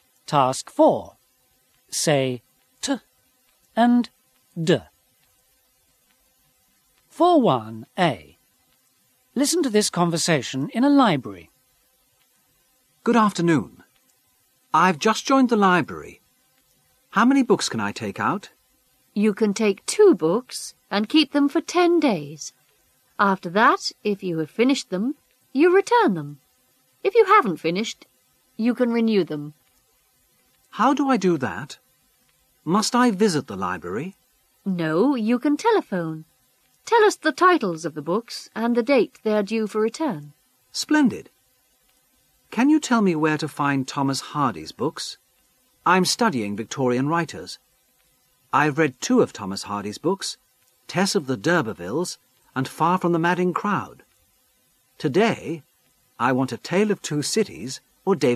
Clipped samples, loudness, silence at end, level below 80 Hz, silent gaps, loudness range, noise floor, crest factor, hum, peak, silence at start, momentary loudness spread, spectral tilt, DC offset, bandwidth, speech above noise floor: under 0.1%; -22 LUFS; 0 s; -68 dBFS; none; 5 LU; -64 dBFS; 20 dB; none; -4 dBFS; 0.3 s; 15 LU; -5 dB/octave; under 0.1%; 14 kHz; 43 dB